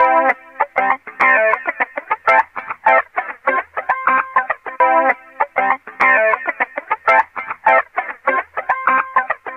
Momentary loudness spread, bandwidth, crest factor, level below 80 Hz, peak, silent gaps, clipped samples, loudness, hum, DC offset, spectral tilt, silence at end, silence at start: 8 LU; 7.8 kHz; 16 dB; -64 dBFS; -2 dBFS; none; under 0.1%; -16 LUFS; none; under 0.1%; -4.5 dB/octave; 0 s; 0 s